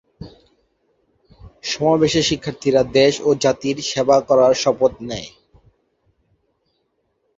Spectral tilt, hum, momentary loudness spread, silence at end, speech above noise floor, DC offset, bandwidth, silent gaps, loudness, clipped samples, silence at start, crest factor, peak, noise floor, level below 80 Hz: -4.5 dB/octave; none; 15 LU; 2.1 s; 52 dB; under 0.1%; 8 kHz; none; -17 LUFS; under 0.1%; 0.2 s; 18 dB; -2 dBFS; -69 dBFS; -50 dBFS